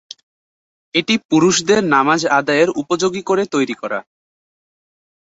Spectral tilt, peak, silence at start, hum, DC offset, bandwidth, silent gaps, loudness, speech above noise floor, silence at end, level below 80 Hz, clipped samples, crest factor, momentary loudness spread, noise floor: -4 dB/octave; -2 dBFS; 0.95 s; none; under 0.1%; 8.2 kHz; 1.25-1.29 s; -16 LUFS; over 74 dB; 1.2 s; -58 dBFS; under 0.1%; 16 dB; 7 LU; under -90 dBFS